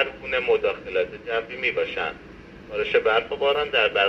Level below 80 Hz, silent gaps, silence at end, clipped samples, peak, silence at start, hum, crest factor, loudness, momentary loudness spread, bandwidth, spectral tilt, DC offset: -52 dBFS; none; 0 s; under 0.1%; -8 dBFS; 0 s; none; 16 dB; -24 LUFS; 11 LU; 6.6 kHz; -4.5 dB/octave; under 0.1%